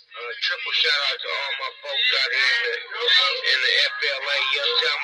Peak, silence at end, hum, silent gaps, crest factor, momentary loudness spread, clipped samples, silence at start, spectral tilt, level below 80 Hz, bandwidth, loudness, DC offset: -4 dBFS; 0 s; none; none; 18 dB; 9 LU; under 0.1%; 0.1 s; 3.5 dB/octave; -86 dBFS; 14 kHz; -20 LUFS; under 0.1%